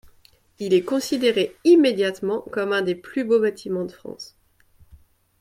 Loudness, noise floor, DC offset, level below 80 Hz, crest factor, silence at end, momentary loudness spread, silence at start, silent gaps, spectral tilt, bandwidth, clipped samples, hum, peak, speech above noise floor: -21 LUFS; -57 dBFS; under 0.1%; -60 dBFS; 18 dB; 1.15 s; 18 LU; 0.6 s; none; -5 dB/octave; 15.5 kHz; under 0.1%; none; -6 dBFS; 35 dB